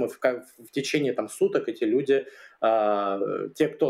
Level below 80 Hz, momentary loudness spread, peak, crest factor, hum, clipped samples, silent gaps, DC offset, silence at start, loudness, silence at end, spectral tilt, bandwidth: -80 dBFS; 8 LU; -8 dBFS; 18 dB; none; under 0.1%; none; under 0.1%; 0 s; -26 LUFS; 0 s; -5 dB/octave; 15 kHz